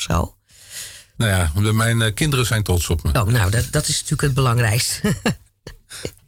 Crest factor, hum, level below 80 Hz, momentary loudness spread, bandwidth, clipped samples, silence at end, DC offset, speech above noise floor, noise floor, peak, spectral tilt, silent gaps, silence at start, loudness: 10 dB; none; -32 dBFS; 15 LU; 17 kHz; under 0.1%; 0.2 s; under 0.1%; 24 dB; -42 dBFS; -10 dBFS; -4.5 dB/octave; none; 0 s; -19 LUFS